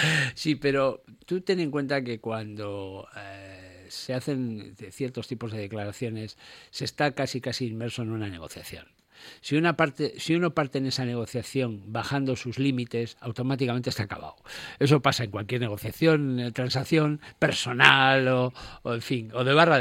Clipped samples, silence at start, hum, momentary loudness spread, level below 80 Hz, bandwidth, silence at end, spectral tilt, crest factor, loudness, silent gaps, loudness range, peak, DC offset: under 0.1%; 0 s; none; 17 LU; -60 dBFS; 16.5 kHz; 0 s; -5.5 dB/octave; 26 dB; -26 LUFS; none; 11 LU; 0 dBFS; under 0.1%